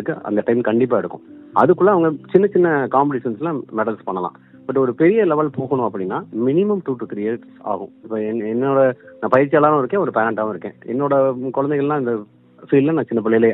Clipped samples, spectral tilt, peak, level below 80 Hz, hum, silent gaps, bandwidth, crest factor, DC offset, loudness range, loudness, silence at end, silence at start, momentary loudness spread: under 0.1%; -10.5 dB/octave; 0 dBFS; -66 dBFS; none; none; 4 kHz; 18 dB; under 0.1%; 4 LU; -18 LUFS; 0 s; 0 s; 12 LU